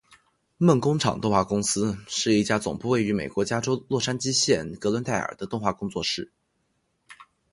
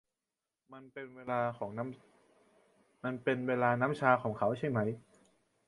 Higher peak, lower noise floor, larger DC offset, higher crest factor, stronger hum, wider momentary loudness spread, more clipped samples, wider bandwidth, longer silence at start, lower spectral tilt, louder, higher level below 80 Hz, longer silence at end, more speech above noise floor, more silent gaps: first, -6 dBFS vs -10 dBFS; second, -73 dBFS vs under -90 dBFS; neither; about the same, 20 dB vs 24 dB; neither; second, 7 LU vs 17 LU; neither; about the same, 11.5 kHz vs 11.5 kHz; about the same, 0.6 s vs 0.7 s; second, -4.5 dB/octave vs -8 dB/octave; first, -25 LUFS vs -33 LUFS; first, -54 dBFS vs -72 dBFS; second, 0.3 s vs 0.7 s; second, 48 dB vs over 56 dB; neither